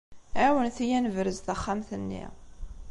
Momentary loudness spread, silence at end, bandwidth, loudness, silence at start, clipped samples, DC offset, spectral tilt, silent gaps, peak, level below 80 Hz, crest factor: 20 LU; 0 s; 11 kHz; -29 LUFS; 0.1 s; under 0.1%; under 0.1%; -5.5 dB/octave; none; -12 dBFS; -46 dBFS; 16 dB